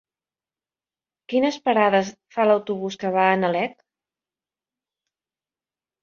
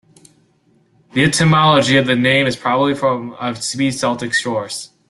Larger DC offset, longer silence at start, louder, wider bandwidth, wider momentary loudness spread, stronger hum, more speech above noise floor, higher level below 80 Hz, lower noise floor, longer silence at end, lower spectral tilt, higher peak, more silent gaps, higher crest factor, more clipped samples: neither; first, 1.3 s vs 1.15 s; second, -22 LUFS vs -15 LUFS; second, 7.4 kHz vs 12.5 kHz; about the same, 9 LU vs 11 LU; neither; first, over 69 dB vs 41 dB; second, -70 dBFS vs -52 dBFS; first, under -90 dBFS vs -57 dBFS; first, 2.35 s vs 0.25 s; about the same, -5.5 dB/octave vs -4.5 dB/octave; second, -4 dBFS vs 0 dBFS; neither; about the same, 20 dB vs 16 dB; neither